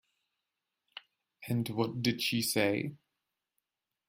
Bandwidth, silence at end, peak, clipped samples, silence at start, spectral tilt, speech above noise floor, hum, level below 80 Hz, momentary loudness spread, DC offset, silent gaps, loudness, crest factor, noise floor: 16 kHz; 1.15 s; -14 dBFS; under 0.1%; 0.95 s; -4.5 dB/octave; 56 dB; none; -72 dBFS; 21 LU; under 0.1%; none; -32 LUFS; 22 dB; -87 dBFS